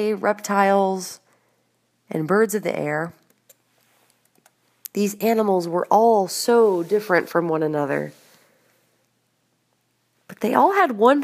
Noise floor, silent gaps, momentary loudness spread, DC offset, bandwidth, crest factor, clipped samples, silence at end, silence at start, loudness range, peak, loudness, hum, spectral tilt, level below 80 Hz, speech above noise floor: -68 dBFS; none; 13 LU; under 0.1%; 15.5 kHz; 20 dB; under 0.1%; 0 s; 0 s; 7 LU; -2 dBFS; -20 LUFS; none; -5 dB/octave; -78 dBFS; 49 dB